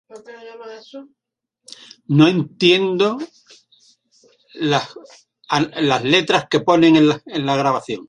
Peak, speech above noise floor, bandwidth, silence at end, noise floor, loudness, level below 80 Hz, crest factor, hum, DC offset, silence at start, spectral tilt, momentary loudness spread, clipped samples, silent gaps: -2 dBFS; 39 dB; 10 kHz; 0.05 s; -56 dBFS; -16 LUFS; -60 dBFS; 18 dB; none; under 0.1%; 0.15 s; -5.5 dB/octave; 23 LU; under 0.1%; none